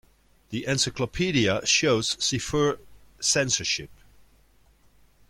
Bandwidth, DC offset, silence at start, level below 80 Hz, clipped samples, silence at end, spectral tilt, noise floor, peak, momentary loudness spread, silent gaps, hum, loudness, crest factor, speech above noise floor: 16.5 kHz; under 0.1%; 0.5 s; -52 dBFS; under 0.1%; 1.35 s; -3 dB/octave; -59 dBFS; -8 dBFS; 8 LU; none; none; -24 LUFS; 20 dB; 34 dB